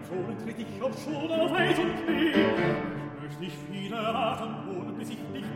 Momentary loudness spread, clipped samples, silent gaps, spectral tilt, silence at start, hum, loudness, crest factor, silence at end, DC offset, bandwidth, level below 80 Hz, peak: 13 LU; under 0.1%; none; -6 dB/octave; 0 s; none; -30 LUFS; 20 dB; 0 s; under 0.1%; 16 kHz; -60 dBFS; -10 dBFS